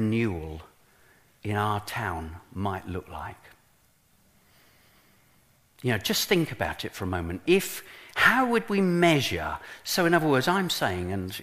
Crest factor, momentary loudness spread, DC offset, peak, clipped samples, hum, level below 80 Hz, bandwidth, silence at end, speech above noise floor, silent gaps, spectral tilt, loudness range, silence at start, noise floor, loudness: 22 dB; 15 LU; under 0.1%; -6 dBFS; under 0.1%; none; -52 dBFS; 15.5 kHz; 0 s; 37 dB; none; -4.5 dB/octave; 14 LU; 0 s; -63 dBFS; -26 LUFS